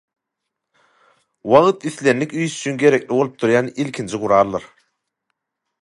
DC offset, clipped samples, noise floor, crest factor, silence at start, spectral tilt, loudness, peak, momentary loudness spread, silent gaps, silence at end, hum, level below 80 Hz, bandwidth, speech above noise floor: under 0.1%; under 0.1%; -80 dBFS; 20 dB; 1.45 s; -5.5 dB/octave; -18 LUFS; 0 dBFS; 11 LU; none; 1.15 s; none; -60 dBFS; 11.5 kHz; 63 dB